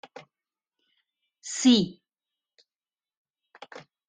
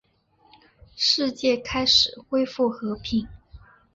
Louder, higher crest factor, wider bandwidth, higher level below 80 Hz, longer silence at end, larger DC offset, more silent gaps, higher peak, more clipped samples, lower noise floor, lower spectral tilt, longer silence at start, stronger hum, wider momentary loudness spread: about the same, -23 LUFS vs -22 LUFS; about the same, 22 dB vs 20 dB; first, 9.6 kHz vs 7.8 kHz; second, -70 dBFS vs -50 dBFS; about the same, 0.3 s vs 0.4 s; neither; first, 3.17-3.34 s vs none; second, -10 dBFS vs -6 dBFS; neither; first, under -90 dBFS vs -62 dBFS; about the same, -3.5 dB/octave vs -3 dB/octave; first, 1.45 s vs 0.95 s; neither; first, 25 LU vs 10 LU